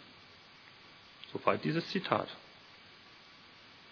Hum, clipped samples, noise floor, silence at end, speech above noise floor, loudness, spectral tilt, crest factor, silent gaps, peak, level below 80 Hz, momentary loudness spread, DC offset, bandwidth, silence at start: none; under 0.1%; -57 dBFS; 0 s; 24 dB; -34 LUFS; -4 dB/octave; 28 dB; none; -10 dBFS; -78 dBFS; 22 LU; under 0.1%; 5.4 kHz; 0 s